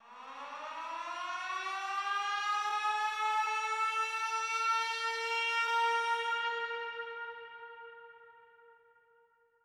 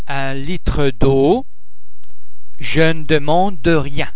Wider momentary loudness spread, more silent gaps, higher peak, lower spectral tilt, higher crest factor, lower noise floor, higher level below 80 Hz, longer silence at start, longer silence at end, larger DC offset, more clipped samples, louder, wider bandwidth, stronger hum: first, 16 LU vs 8 LU; neither; second, -22 dBFS vs 0 dBFS; second, 2 dB/octave vs -10 dB/octave; about the same, 14 dB vs 16 dB; first, -69 dBFS vs -41 dBFS; second, -88 dBFS vs -30 dBFS; about the same, 0.05 s vs 0.05 s; first, 0.9 s vs 0.05 s; second, under 0.1% vs 20%; neither; second, -33 LUFS vs -17 LUFS; first, 15.5 kHz vs 4 kHz; first, 50 Hz at -85 dBFS vs none